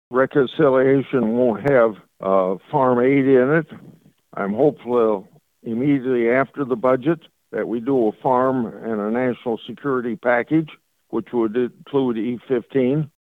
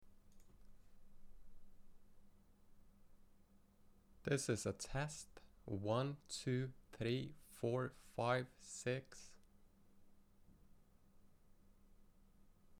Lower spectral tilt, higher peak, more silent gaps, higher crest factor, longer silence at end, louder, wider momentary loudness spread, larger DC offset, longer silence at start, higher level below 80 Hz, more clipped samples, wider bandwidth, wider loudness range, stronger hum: first, -9.5 dB/octave vs -5 dB/octave; first, -4 dBFS vs -26 dBFS; neither; second, 16 dB vs 22 dB; first, 0.25 s vs 0 s; first, -20 LUFS vs -44 LUFS; second, 11 LU vs 14 LU; neither; about the same, 0.1 s vs 0 s; first, -60 dBFS vs -66 dBFS; neither; second, 4.2 kHz vs 15.5 kHz; about the same, 5 LU vs 7 LU; neither